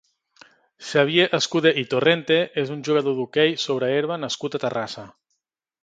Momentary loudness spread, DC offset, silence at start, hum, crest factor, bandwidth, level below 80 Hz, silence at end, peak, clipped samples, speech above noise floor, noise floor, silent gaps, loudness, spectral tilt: 8 LU; under 0.1%; 0.8 s; none; 20 dB; 9.2 kHz; -68 dBFS; 0.7 s; -2 dBFS; under 0.1%; 57 dB; -79 dBFS; none; -21 LUFS; -4.5 dB/octave